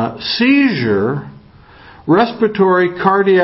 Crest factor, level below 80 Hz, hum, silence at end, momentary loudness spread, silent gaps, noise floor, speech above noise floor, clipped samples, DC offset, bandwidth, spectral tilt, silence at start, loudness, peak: 14 dB; -50 dBFS; none; 0 s; 8 LU; none; -42 dBFS; 29 dB; under 0.1%; under 0.1%; 5.8 kHz; -10 dB/octave; 0 s; -14 LUFS; 0 dBFS